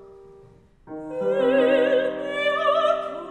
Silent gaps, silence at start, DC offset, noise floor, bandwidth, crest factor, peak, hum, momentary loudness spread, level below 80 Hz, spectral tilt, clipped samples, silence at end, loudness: none; 0 s; under 0.1%; -51 dBFS; 9.2 kHz; 14 dB; -8 dBFS; none; 13 LU; -60 dBFS; -5 dB/octave; under 0.1%; 0 s; -22 LUFS